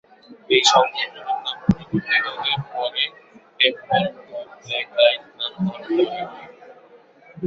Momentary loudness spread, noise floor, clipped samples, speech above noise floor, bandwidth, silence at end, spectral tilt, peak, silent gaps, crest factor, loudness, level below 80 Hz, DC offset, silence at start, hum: 13 LU; -50 dBFS; under 0.1%; 29 dB; 8.2 kHz; 0 s; -3.5 dB/octave; -2 dBFS; none; 22 dB; -20 LUFS; -54 dBFS; under 0.1%; 0.3 s; none